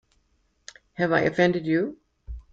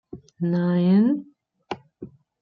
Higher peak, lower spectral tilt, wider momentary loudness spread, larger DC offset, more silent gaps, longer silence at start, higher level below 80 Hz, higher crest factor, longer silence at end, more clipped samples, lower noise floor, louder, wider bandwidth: first, -6 dBFS vs -10 dBFS; second, -6.5 dB/octave vs -10 dB/octave; second, 22 LU vs 25 LU; neither; neither; first, 1 s vs 0.15 s; first, -48 dBFS vs -66 dBFS; first, 20 dB vs 14 dB; second, 0.1 s vs 0.35 s; neither; first, -68 dBFS vs -44 dBFS; second, -24 LUFS vs -21 LUFS; first, 7.8 kHz vs 5.8 kHz